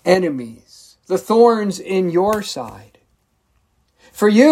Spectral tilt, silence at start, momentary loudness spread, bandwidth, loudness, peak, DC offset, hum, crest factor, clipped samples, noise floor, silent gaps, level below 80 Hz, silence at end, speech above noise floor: -5.5 dB/octave; 0.05 s; 16 LU; 16 kHz; -17 LUFS; 0 dBFS; under 0.1%; none; 16 dB; under 0.1%; -64 dBFS; none; -58 dBFS; 0 s; 48 dB